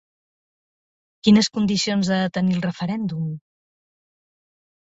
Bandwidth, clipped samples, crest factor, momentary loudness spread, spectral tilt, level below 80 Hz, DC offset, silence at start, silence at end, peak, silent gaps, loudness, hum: 8 kHz; under 0.1%; 20 dB; 12 LU; -5.5 dB/octave; -58 dBFS; under 0.1%; 1.25 s; 1.45 s; -4 dBFS; none; -21 LUFS; none